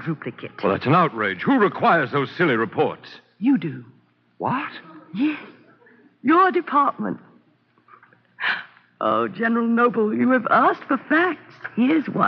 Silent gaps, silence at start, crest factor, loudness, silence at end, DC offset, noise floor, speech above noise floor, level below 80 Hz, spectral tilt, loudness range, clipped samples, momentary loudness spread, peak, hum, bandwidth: none; 0 s; 16 dB; -21 LUFS; 0 s; under 0.1%; -60 dBFS; 40 dB; -74 dBFS; -4.5 dB/octave; 5 LU; under 0.1%; 14 LU; -6 dBFS; none; 5.8 kHz